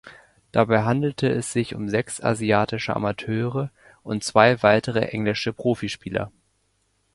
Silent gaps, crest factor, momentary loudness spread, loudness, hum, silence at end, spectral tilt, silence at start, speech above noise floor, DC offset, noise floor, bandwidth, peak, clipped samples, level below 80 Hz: none; 22 dB; 12 LU; -23 LUFS; none; 0.85 s; -5.5 dB/octave; 0.05 s; 46 dB; under 0.1%; -68 dBFS; 11.5 kHz; 0 dBFS; under 0.1%; -54 dBFS